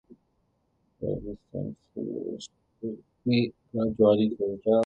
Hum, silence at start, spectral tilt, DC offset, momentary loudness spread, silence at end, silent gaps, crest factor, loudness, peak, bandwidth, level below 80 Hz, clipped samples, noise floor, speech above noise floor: none; 1 s; -7.5 dB/octave; under 0.1%; 16 LU; 0 s; none; 20 dB; -29 LUFS; -10 dBFS; 8.4 kHz; -58 dBFS; under 0.1%; -72 dBFS; 45 dB